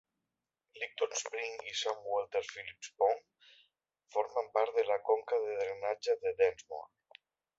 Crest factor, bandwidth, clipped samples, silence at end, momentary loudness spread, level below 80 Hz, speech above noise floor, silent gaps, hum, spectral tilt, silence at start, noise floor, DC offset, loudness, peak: 20 dB; 8 kHz; under 0.1%; 0.7 s; 13 LU; -78 dBFS; 55 dB; none; none; -0.5 dB/octave; 0.75 s; -89 dBFS; under 0.1%; -35 LUFS; -16 dBFS